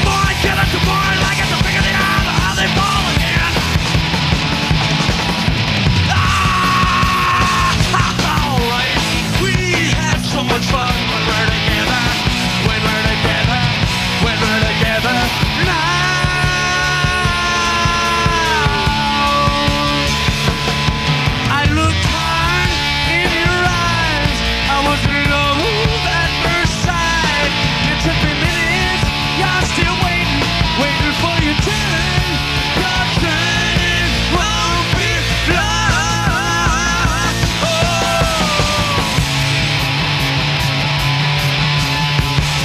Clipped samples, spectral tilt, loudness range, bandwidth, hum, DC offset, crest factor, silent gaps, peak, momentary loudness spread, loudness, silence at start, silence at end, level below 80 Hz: under 0.1%; -4 dB/octave; 1 LU; 15.5 kHz; none; under 0.1%; 14 dB; none; 0 dBFS; 2 LU; -14 LUFS; 0 s; 0 s; -26 dBFS